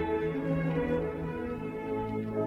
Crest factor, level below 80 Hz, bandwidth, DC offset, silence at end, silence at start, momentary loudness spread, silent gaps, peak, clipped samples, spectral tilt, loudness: 14 dB; -50 dBFS; 5.8 kHz; under 0.1%; 0 s; 0 s; 6 LU; none; -18 dBFS; under 0.1%; -9 dB/octave; -33 LUFS